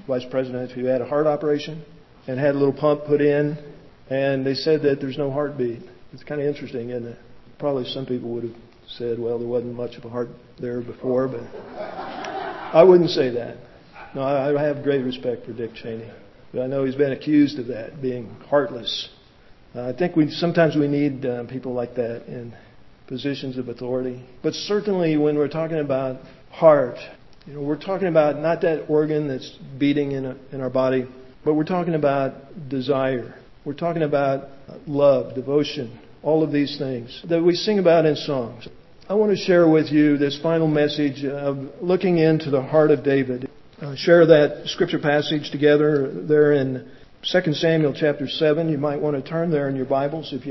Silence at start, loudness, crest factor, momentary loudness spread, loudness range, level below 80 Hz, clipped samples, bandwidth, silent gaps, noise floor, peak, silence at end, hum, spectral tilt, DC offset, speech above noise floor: 0.1 s; -21 LUFS; 22 dB; 16 LU; 9 LU; -58 dBFS; under 0.1%; 6.2 kHz; none; -49 dBFS; 0 dBFS; 0 s; none; -7 dB/octave; under 0.1%; 28 dB